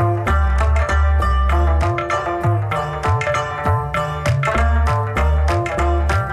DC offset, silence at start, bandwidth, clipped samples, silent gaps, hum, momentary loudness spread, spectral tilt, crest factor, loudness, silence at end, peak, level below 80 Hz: under 0.1%; 0 s; 10.5 kHz; under 0.1%; none; none; 3 LU; -6.5 dB/octave; 10 dB; -18 LUFS; 0 s; -8 dBFS; -20 dBFS